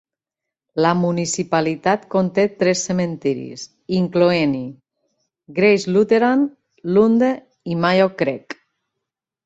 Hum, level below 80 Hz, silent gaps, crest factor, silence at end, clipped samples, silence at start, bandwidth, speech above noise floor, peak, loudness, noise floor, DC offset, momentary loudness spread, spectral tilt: none; -60 dBFS; none; 16 dB; 0.9 s; under 0.1%; 0.75 s; 8.2 kHz; 68 dB; -2 dBFS; -18 LUFS; -85 dBFS; under 0.1%; 14 LU; -5.5 dB/octave